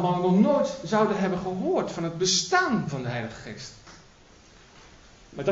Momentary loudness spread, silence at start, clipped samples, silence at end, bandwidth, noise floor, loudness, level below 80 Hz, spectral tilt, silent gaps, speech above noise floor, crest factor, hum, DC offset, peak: 18 LU; 0 s; under 0.1%; 0 s; 8 kHz; -53 dBFS; -25 LUFS; -58 dBFS; -4.5 dB/octave; none; 28 dB; 20 dB; none; under 0.1%; -8 dBFS